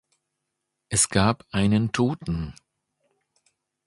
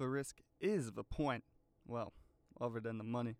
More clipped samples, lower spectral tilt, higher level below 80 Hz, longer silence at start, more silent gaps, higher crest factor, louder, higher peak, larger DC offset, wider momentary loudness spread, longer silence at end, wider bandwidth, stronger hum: neither; second, -4.5 dB/octave vs -6.5 dB/octave; first, -46 dBFS vs -60 dBFS; first, 0.9 s vs 0 s; neither; about the same, 22 dB vs 18 dB; first, -23 LUFS vs -43 LUFS; first, -4 dBFS vs -24 dBFS; neither; first, 11 LU vs 8 LU; first, 1.35 s vs 0.05 s; second, 11.5 kHz vs 15.5 kHz; neither